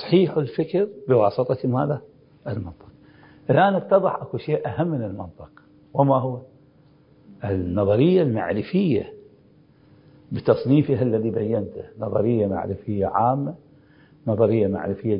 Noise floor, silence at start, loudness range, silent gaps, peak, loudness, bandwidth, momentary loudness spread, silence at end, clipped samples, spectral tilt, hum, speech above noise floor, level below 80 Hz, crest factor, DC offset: -54 dBFS; 0 s; 3 LU; none; -4 dBFS; -22 LUFS; 5.4 kHz; 14 LU; 0 s; under 0.1%; -12.5 dB/octave; none; 33 dB; -50 dBFS; 20 dB; under 0.1%